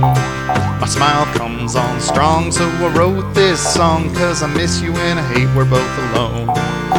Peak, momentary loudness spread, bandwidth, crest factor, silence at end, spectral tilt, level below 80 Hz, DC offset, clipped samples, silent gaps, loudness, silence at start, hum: 0 dBFS; 4 LU; 18 kHz; 14 dB; 0 s; -5 dB/octave; -34 dBFS; under 0.1%; under 0.1%; none; -15 LUFS; 0 s; none